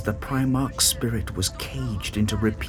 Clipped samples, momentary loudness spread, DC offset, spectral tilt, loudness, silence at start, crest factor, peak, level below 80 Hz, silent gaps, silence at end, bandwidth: under 0.1%; 8 LU; under 0.1%; -4 dB/octave; -24 LUFS; 0 s; 18 dB; -6 dBFS; -36 dBFS; none; 0 s; 19 kHz